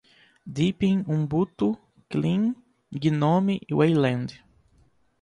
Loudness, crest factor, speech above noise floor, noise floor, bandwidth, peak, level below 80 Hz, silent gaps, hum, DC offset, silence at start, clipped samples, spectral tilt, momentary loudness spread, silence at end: -25 LUFS; 16 dB; 39 dB; -62 dBFS; 10 kHz; -10 dBFS; -58 dBFS; none; none; under 0.1%; 0.45 s; under 0.1%; -8 dB/octave; 15 LU; 0.85 s